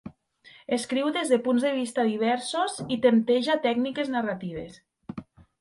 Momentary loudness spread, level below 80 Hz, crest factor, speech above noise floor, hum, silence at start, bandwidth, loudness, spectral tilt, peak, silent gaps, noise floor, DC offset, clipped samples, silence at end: 19 LU; -64 dBFS; 18 dB; 30 dB; none; 0.05 s; 11.5 kHz; -26 LUFS; -4.5 dB/octave; -8 dBFS; none; -55 dBFS; under 0.1%; under 0.1%; 0.4 s